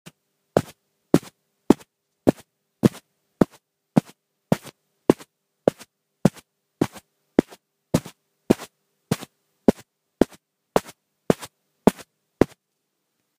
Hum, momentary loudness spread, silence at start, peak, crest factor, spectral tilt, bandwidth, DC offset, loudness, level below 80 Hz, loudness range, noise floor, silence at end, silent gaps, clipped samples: none; 8 LU; 0.55 s; 0 dBFS; 26 dB; -7 dB/octave; 15.5 kHz; under 0.1%; -25 LUFS; -52 dBFS; 2 LU; -77 dBFS; 0.95 s; none; under 0.1%